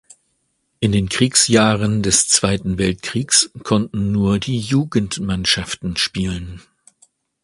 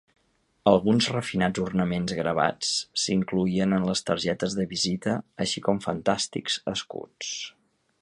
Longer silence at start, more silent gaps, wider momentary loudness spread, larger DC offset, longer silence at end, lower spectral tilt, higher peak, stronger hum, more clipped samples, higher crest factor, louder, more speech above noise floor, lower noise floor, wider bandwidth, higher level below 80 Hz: first, 0.8 s vs 0.65 s; neither; about the same, 10 LU vs 10 LU; neither; first, 0.85 s vs 0.5 s; about the same, -3.5 dB/octave vs -4.5 dB/octave; first, 0 dBFS vs -4 dBFS; neither; neither; about the same, 18 dB vs 22 dB; first, -17 LUFS vs -26 LUFS; first, 51 dB vs 39 dB; about the same, -68 dBFS vs -65 dBFS; about the same, 11.5 kHz vs 11.5 kHz; first, -40 dBFS vs -56 dBFS